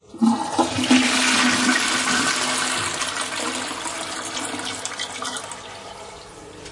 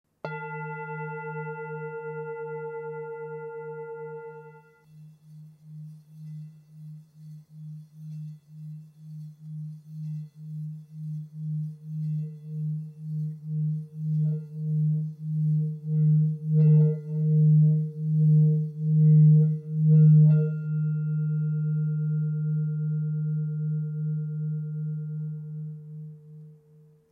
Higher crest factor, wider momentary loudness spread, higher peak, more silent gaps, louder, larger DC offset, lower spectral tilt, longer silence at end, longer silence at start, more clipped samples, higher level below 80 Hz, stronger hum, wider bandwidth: first, 20 dB vs 14 dB; second, 19 LU vs 23 LU; first, -4 dBFS vs -12 dBFS; neither; first, -21 LUFS vs -26 LUFS; neither; second, -1.5 dB/octave vs -12.5 dB/octave; second, 0 s vs 0.6 s; second, 0.1 s vs 0.25 s; neither; first, -58 dBFS vs -78 dBFS; neither; first, 11.5 kHz vs 2.8 kHz